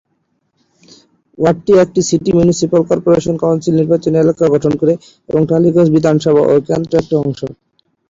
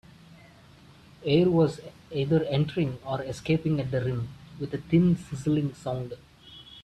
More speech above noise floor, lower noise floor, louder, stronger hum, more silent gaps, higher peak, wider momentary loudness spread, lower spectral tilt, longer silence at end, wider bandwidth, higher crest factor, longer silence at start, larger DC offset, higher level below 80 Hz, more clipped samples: first, 52 dB vs 27 dB; first, -64 dBFS vs -53 dBFS; first, -13 LUFS vs -27 LUFS; neither; neither; first, -2 dBFS vs -10 dBFS; second, 6 LU vs 16 LU; about the same, -7 dB/octave vs -8 dB/octave; first, 0.55 s vs 0 s; second, 7.8 kHz vs 9.8 kHz; about the same, 12 dB vs 16 dB; first, 1.4 s vs 1.2 s; neither; first, -46 dBFS vs -56 dBFS; neither